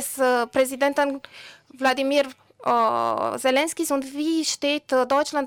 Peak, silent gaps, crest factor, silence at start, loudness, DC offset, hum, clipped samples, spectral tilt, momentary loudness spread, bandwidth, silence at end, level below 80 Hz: -10 dBFS; none; 12 dB; 0 s; -23 LUFS; under 0.1%; none; under 0.1%; -2 dB/octave; 6 LU; 19 kHz; 0 s; -66 dBFS